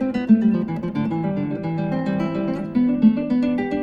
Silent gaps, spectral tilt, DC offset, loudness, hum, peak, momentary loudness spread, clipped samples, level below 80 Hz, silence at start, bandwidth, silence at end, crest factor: none; -9.5 dB/octave; under 0.1%; -21 LUFS; none; -4 dBFS; 8 LU; under 0.1%; -50 dBFS; 0 s; 5.6 kHz; 0 s; 16 dB